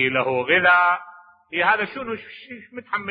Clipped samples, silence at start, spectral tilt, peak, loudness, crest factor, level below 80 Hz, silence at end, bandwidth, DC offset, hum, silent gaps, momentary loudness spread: under 0.1%; 0 s; -8.5 dB/octave; -4 dBFS; -20 LUFS; 18 dB; -66 dBFS; 0 s; 5.2 kHz; under 0.1%; none; none; 22 LU